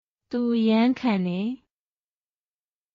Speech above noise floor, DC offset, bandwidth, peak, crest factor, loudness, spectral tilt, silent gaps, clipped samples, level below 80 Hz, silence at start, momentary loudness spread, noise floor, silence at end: over 67 dB; under 0.1%; 6.2 kHz; -10 dBFS; 16 dB; -24 LUFS; -5.5 dB/octave; none; under 0.1%; -68 dBFS; 0.3 s; 12 LU; under -90 dBFS; 1.4 s